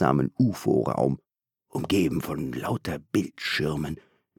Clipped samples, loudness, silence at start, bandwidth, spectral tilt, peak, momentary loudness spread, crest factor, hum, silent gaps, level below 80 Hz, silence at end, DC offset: under 0.1%; -27 LUFS; 0 s; 19 kHz; -6.5 dB/octave; -6 dBFS; 11 LU; 20 dB; none; none; -52 dBFS; 0.45 s; under 0.1%